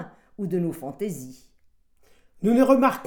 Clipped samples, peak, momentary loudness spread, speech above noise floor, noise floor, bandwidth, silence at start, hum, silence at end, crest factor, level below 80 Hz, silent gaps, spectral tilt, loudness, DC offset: under 0.1%; -4 dBFS; 21 LU; 37 dB; -59 dBFS; 19 kHz; 0 s; none; 0 s; 20 dB; -62 dBFS; none; -7 dB/octave; -24 LUFS; under 0.1%